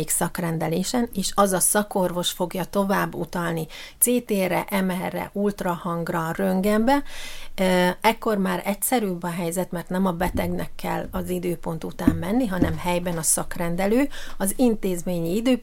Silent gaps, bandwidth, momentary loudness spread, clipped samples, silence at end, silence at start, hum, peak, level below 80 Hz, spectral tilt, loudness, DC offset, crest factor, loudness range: none; 17 kHz; 8 LU; under 0.1%; 0 s; 0 s; none; -2 dBFS; -38 dBFS; -4.5 dB/octave; -24 LUFS; under 0.1%; 20 dB; 3 LU